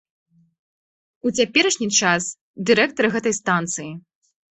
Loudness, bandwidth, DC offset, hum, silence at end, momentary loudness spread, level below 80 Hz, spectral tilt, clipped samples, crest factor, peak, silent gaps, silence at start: -20 LUFS; 8.4 kHz; under 0.1%; none; 0.55 s; 12 LU; -62 dBFS; -2.5 dB/octave; under 0.1%; 20 dB; -2 dBFS; 2.41-2.54 s; 1.25 s